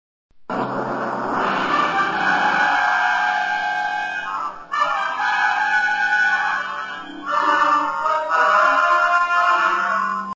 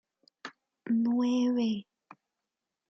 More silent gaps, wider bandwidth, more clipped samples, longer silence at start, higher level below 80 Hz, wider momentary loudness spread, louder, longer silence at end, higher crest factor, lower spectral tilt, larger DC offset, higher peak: neither; first, 8 kHz vs 6.6 kHz; neither; about the same, 0.35 s vs 0.45 s; first, -60 dBFS vs -80 dBFS; second, 9 LU vs 20 LU; first, -19 LUFS vs -29 LUFS; second, 0 s vs 1.05 s; about the same, 16 dB vs 12 dB; second, -3 dB/octave vs -6 dB/octave; neither; first, -4 dBFS vs -20 dBFS